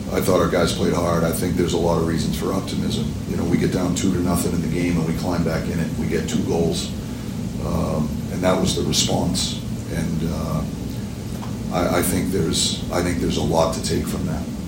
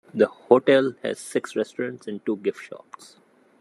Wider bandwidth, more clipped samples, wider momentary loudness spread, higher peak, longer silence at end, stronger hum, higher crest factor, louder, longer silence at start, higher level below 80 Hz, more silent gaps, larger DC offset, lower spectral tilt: first, 16.5 kHz vs 12.5 kHz; neither; second, 8 LU vs 17 LU; about the same, -4 dBFS vs -2 dBFS; second, 0 s vs 0.85 s; neither; second, 16 dB vs 22 dB; about the same, -22 LUFS vs -23 LUFS; second, 0 s vs 0.15 s; first, -36 dBFS vs -78 dBFS; neither; neither; about the same, -5 dB/octave vs -5 dB/octave